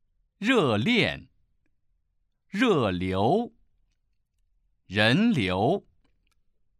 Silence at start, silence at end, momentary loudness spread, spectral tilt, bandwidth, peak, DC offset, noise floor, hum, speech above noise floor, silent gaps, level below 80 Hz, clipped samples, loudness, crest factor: 0.4 s; 1 s; 9 LU; -6 dB/octave; 12.5 kHz; -8 dBFS; under 0.1%; -73 dBFS; none; 49 dB; none; -60 dBFS; under 0.1%; -24 LUFS; 20 dB